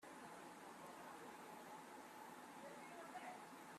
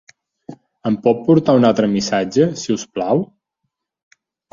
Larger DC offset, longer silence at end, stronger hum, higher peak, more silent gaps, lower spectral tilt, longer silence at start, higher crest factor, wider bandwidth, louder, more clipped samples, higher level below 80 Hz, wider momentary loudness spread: neither; second, 0 s vs 1.3 s; neither; second, -42 dBFS vs -2 dBFS; neither; second, -3.5 dB/octave vs -6 dB/octave; second, 0 s vs 0.5 s; about the same, 14 dB vs 16 dB; first, 15.5 kHz vs 7.6 kHz; second, -57 LUFS vs -17 LUFS; neither; second, under -90 dBFS vs -56 dBFS; second, 3 LU vs 9 LU